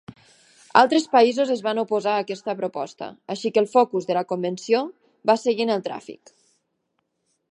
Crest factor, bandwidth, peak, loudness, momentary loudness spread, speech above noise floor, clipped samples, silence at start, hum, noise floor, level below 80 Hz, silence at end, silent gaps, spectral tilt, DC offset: 22 dB; 10.5 kHz; 0 dBFS; -22 LUFS; 15 LU; 53 dB; under 0.1%; 0.1 s; none; -74 dBFS; -74 dBFS; 1.4 s; none; -4.5 dB/octave; under 0.1%